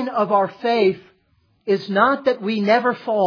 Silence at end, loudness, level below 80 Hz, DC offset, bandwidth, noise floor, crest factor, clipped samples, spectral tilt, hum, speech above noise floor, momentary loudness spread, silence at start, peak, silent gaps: 0 s; -19 LUFS; -66 dBFS; under 0.1%; 5.4 kHz; -62 dBFS; 18 dB; under 0.1%; -7 dB/octave; none; 44 dB; 6 LU; 0 s; -2 dBFS; none